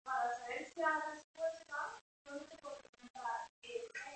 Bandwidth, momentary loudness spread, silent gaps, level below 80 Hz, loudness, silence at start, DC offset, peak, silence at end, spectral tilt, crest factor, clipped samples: 8.4 kHz; 15 LU; 1.24-1.34 s, 2.01-2.25 s, 2.89-2.93 s, 3.10-3.14 s, 3.49-3.62 s; -82 dBFS; -43 LUFS; 0.05 s; under 0.1%; -24 dBFS; 0 s; -2 dB/octave; 20 dB; under 0.1%